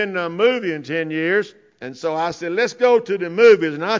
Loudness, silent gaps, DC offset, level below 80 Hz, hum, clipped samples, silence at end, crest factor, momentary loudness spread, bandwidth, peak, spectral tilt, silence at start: -18 LUFS; none; under 0.1%; -66 dBFS; none; under 0.1%; 0 s; 16 dB; 13 LU; 7.6 kHz; -4 dBFS; -5 dB/octave; 0 s